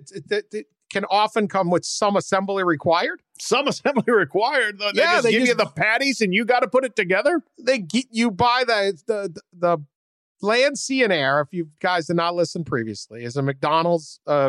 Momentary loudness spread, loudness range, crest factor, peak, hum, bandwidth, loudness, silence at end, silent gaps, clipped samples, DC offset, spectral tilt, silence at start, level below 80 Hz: 9 LU; 3 LU; 14 dB; -8 dBFS; none; 12.5 kHz; -21 LUFS; 0 s; 9.95-10.35 s; under 0.1%; under 0.1%; -4 dB/octave; 0.05 s; -64 dBFS